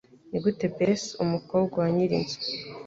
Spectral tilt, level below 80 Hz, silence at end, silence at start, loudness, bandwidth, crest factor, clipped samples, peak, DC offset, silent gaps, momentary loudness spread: -6 dB/octave; -60 dBFS; 0 s; 0.25 s; -27 LUFS; 7.8 kHz; 16 dB; under 0.1%; -12 dBFS; under 0.1%; none; 6 LU